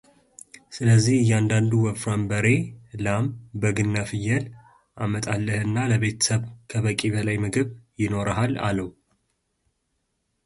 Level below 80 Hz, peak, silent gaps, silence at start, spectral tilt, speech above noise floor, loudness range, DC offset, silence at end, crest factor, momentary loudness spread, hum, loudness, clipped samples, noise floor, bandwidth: -50 dBFS; -6 dBFS; none; 0.7 s; -5.5 dB/octave; 52 dB; 4 LU; under 0.1%; 1.55 s; 18 dB; 10 LU; none; -24 LUFS; under 0.1%; -75 dBFS; 11.5 kHz